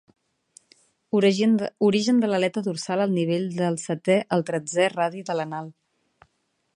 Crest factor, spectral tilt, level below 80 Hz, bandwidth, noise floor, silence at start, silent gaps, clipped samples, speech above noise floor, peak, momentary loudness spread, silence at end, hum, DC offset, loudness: 18 dB; -5.5 dB/octave; -72 dBFS; 11 kHz; -72 dBFS; 1.15 s; none; under 0.1%; 49 dB; -6 dBFS; 8 LU; 1.05 s; none; under 0.1%; -23 LUFS